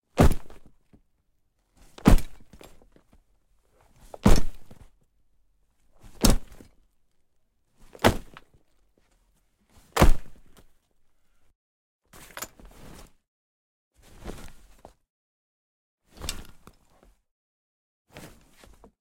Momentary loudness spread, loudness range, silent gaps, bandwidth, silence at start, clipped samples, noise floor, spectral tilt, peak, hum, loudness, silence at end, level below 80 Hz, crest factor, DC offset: 26 LU; 19 LU; 11.55-11.99 s, 13.28-13.91 s, 15.10-15.98 s; 16.5 kHz; 0.15 s; under 0.1%; -69 dBFS; -5 dB/octave; -2 dBFS; none; -26 LUFS; 2.65 s; -32 dBFS; 24 dB; under 0.1%